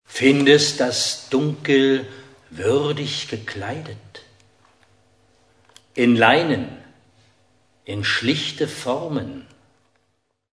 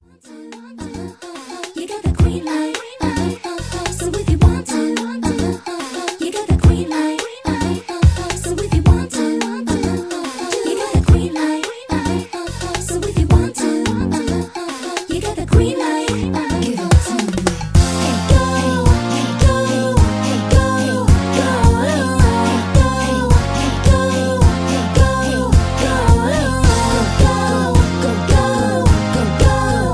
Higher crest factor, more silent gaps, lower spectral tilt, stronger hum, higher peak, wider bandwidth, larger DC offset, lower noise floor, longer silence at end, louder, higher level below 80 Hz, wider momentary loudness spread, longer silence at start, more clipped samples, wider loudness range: first, 22 dB vs 14 dB; neither; second, -4 dB/octave vs -5.5 dB/octave; neither; about the same, 0 dBFS vs 0 dBFS; about the same, 11 kHz vs 11 kHz; neither; first, -70 dBFS vs -38 dBFS; first, 1.15 s vs 0 s; second, -19 LUFS vs -16 LUFS; second, -62 dBFS vs -22 dBFS; first, 19 LU vs 9 LU; second, 0.1 s vs 0.3 s; neither; first, 8 LU vs 4 LU